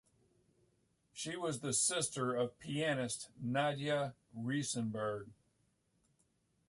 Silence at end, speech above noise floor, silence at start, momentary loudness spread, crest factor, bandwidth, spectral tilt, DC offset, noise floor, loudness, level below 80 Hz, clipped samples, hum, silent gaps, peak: 1.35 s; 40 dB; 1.15 s; 12 LU; 18 dB; 11.5 kHz; -3.5 dB/octave; under 0.1%; -78 dBFS; -37 LUFS; -76 dBFS; under 0.1%; none; none; -22 dBFS